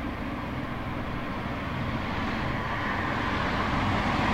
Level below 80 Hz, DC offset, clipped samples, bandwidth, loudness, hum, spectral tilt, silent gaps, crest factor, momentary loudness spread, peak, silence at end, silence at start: -40 dBFS; under 0.1%; under 0.1%; 16 kHz; -30 LUFS; none; -6.5 dB/octave; none; 16 dB; 7 LU; -14 dBFS; 0 s; 0 s